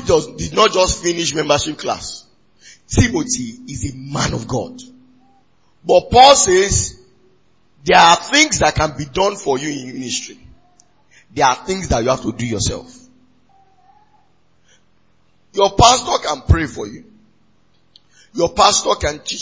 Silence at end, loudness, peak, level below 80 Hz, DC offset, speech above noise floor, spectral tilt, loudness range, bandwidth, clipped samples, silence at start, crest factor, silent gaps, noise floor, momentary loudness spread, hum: 0 s; -15 LUFS; 0 dBFS; -32 dBFS; 0.2%; 44 dB; -3.5 dB/octave; 9 LU; 8 kHz; under 0.1%; 0 s; 18 dB; none; -60 dBFS; 16 LU; none